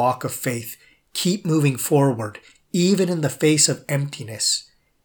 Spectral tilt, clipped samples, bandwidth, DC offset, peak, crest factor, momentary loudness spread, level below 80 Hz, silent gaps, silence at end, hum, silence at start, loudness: -4.5 dB/octave; under 0.1%; over 20 kHz; under 0.1%; -2 dBFS; 20 dB; 13 LU; -68 dBFS; none; 0.4 s; none; 0 s; -21 LUFS